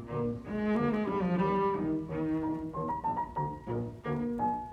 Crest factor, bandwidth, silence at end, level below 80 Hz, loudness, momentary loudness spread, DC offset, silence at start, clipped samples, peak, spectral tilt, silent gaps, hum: 14 dB; 8.4 kHz; 0 s; -54 dBFS; -33 LUFS; 7 LU; under 0.1%; 0 s; under 0.1%; -18 dBFS; -9 dB/octave; none; none